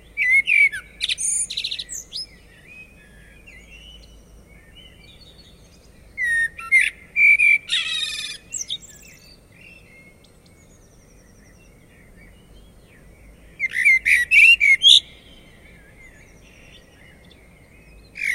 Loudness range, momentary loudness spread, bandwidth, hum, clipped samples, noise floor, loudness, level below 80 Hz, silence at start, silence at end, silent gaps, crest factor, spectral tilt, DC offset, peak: 20 LU; 19 LU; 16 kHz; none; under 0.1%; -50 dBFS; -16 LUFS; -52 dBFS; 0.15 s; 0 s; none; 22 dB; 2 dB/octave; under 0.1%; 0 dBFS